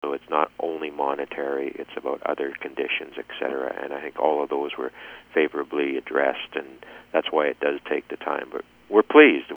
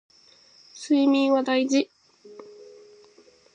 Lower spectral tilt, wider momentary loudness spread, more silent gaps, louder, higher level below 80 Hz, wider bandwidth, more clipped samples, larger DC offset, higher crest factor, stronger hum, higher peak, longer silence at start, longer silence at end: first, -5.5 dB/octave vs -3 dB/octave; second, 11 LU vs 23 LU; neither; about the same, -24 LUFS vs -22 LUFS; first, -68 dBFS vs -82 dBFS; first, over 20 kHz vs 9.4 kHz; neither; neither; first, 22 dB vs 16 dB; neither; first, -2 dBFS vs -10 dBFS; second, 0.05 s vs 0.75 s; second, 0 s vs 1.1 s